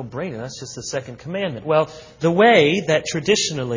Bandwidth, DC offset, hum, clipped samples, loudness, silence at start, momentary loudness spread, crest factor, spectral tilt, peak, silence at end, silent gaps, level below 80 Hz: 7.6 kHz; under 0.1%; none; under 0.1%; -19 LUFS; 0 s; 16 LU; 18 dB; -4 dB/octave; -2 dBFS; 0 s; none; -56 dBFS